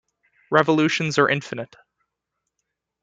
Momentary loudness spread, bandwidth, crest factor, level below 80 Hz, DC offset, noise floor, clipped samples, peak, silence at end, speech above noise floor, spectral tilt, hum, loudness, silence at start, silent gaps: 15 LU; 9 kHz; 22 dB; -66 dBFS; under 0.1%; -81 dBFS; under 0.1%; -2 dBFS; 1.4 s; 60 dB; -5 dB/octave; none; -20 LUFS; 0.5 s; none